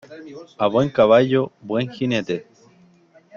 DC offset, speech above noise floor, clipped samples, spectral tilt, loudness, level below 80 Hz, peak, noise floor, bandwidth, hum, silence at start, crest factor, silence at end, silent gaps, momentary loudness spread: under 0.1%; 34 dB; under 0.1%; -7 dB/octave; -19 LUFS; -60 dBFS; -2 dBFS; -53 dBFS; 7.2 kHz; none; 0.1 s; 18 dB; 0.95 s; none; 21 LU